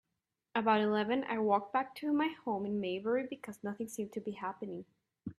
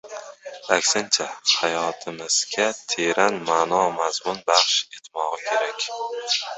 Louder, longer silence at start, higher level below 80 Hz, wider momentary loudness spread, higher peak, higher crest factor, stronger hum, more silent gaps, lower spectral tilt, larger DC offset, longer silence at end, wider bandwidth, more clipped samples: second, -35 LUFS vs -22 LUFS; first, 0.55 s vs 0.05 s; second, -78 dBFS vs -68 dBFS; first, 13 LU vs 10 LU; second, -16 dBFS vs -2 dBFS; about the same, 20 dB vs 20 dB; neither; neither; first, -5.5 dB/octave vs -0.5 dB/octave; neither; about the same, 0.05 s vs 0 s; first, 13.5 kHz vs 8.4 kHz; neither